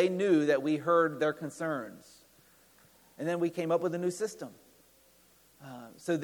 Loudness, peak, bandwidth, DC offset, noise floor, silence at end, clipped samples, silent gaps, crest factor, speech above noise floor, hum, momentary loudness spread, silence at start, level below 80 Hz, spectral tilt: -30 LUFS; -14 dBFS; 19.5 kHz; under 0.1%; -63 dBFS; 0 s; under 0.1%; none; 18 dB; 33 dB; none; 20 LU; 0 s; -78 dBFS; -6 dB/octave